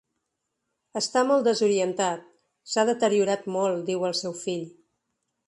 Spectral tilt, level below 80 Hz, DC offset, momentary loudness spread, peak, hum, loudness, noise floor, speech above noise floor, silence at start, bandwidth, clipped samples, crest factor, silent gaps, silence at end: -4 dB/octave; -76 dBFS; under 0.1%; 11 LU; -8 dBFS; none; -25 LUFS; -81 dBFS; 56 dB; 0.95 s; 11.5 kHz; under 0.1%; 18 dB; none; 0.8 s